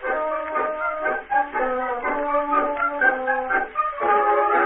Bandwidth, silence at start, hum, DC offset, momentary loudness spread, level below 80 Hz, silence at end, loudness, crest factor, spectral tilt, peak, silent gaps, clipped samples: 3.9 kHz; 0 s; none; under 0.1%; 6 LU; -50 dBFS; 0 s; -22 LUFS; 16 dB; -8 dB/octave; -6 dBFS; none; under 0.1%